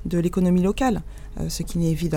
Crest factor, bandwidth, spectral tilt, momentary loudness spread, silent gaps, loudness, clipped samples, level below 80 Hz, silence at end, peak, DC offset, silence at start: 14 dB; 16.5 kHz; -6.5 dB/octave; 11 LU; none; -23 LUFS; under 0.1%; -34 dBFS; 0 s; -8 dBFS; under 0.1%; 0 s